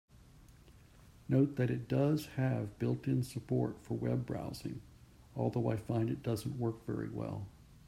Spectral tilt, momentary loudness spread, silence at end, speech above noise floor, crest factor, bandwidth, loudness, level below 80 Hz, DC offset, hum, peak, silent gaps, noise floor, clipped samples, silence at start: -8 dB/octave; 12 LU; 0.1 s; 24 dB; 18 dB; 15 kHz; -36 LUFS; -62 dBFS; under 0.1%; none; -18 dBFS; none; -59 dBFS; under 0.1%; 0.4 s